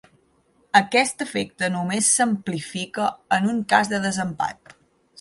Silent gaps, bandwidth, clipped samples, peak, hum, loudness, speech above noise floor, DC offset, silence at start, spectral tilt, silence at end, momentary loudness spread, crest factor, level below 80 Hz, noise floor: none; 11.5 kHz; under 0.1%; -2 dBFS; none; -22 LUFS; 40 dB; under 0.1%; 0.75 s; -3 dB/octave; 0.7 s; 11 LU; 22 dB; -62 dBFS; -62 dBFS